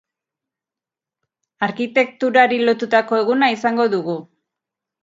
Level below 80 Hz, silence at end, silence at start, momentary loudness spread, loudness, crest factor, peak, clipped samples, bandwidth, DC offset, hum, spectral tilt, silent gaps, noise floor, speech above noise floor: -72 dBFS; 0.8 s; 1.6 s; 9 LU; -17 LUFS; 20 dB; 0 dBFS; under 0.1%; 7.8 kHz; under 0.1%; none; -5.5 dB/octave; none; -89 dBFS; 71 dB